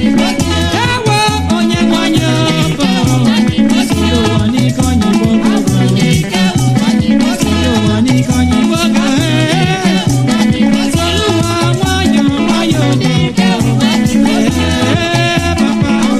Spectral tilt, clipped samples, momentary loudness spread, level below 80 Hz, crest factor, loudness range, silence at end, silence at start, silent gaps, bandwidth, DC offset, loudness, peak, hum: -5.5 dB/octave; under 0.1%; 2 LU; -32 dBFS; 10 dB; 0 LU; 0 s; 0 s; none; 14 kHz; under 0.1%; -11 LUFS; 0 dBFS; none